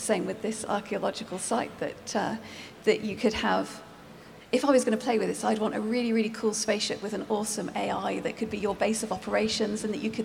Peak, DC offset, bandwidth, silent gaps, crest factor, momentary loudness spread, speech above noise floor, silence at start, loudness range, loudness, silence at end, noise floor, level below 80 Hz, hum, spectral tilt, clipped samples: -10 dBFS; under 0.1%; 16.5 kHz; none; 18 dB; 7 LU; 20 dB; 0 s; 3 LU; -29 LUFS; 0 s; -48 dBFS; -60 dBFS; none; -4 dB/octave; under 0.1%